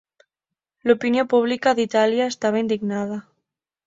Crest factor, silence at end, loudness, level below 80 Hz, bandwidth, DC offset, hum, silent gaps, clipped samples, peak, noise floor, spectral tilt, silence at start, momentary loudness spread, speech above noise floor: 18 dB; 0.65 s; -21 LUFS; -66 dBFS; 7.8 kHz; under 0.1%; none; none; under 0.1%; -4 dBFS; -86 dBFS; -5 dB/octave; 0.85 s; 8 LU; 66 dB